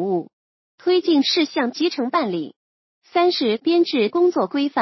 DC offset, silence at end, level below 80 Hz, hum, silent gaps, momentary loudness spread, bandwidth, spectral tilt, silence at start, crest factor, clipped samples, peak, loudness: under 0.1%; 0 s; -78 dBFS; none; 0.33-0.78 s, 2.56-3.02 s; 8 LU; 6.2 kHz; -5 dB/octave; 0 s; 14 dB; under 0.1%; -6 dBFS; -20 LUFS